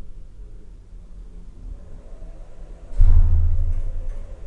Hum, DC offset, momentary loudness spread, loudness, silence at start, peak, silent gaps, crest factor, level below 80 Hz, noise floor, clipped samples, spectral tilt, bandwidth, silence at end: none; under 0.1%; 25 LU; -24 LUFS; 0.05 s; -2 dBFS; none; 18 dB; -20 dBFS; -39 dBFS; under 0.1%; -9 dB/octave; 1.5 kHz; 0 s